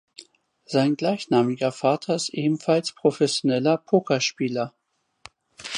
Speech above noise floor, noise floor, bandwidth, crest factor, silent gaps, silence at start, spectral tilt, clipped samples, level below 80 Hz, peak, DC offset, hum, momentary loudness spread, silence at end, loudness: 32 dB; -54 dBFS; 11.5 kHz; 18 dB; none; 0.2 s; -5 dB/octave; under 0.1%; -72 dBFS; -6 dBFS; under 0.1%; none; 6 LU; 0 s; -23 LUFS